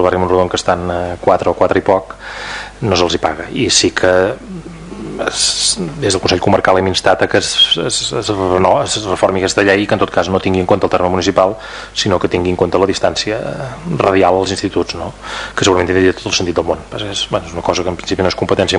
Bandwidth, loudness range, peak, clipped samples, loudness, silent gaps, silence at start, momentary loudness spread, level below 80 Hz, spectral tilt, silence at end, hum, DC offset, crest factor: 11 kHz; 3 LU; 0 dBFS; under 0.1%; -14 LUFS; none; 0 s; 10 LU; -38 dBFS; -3.5 dB/octave; 0 s; none; under 0.1%; 14 dB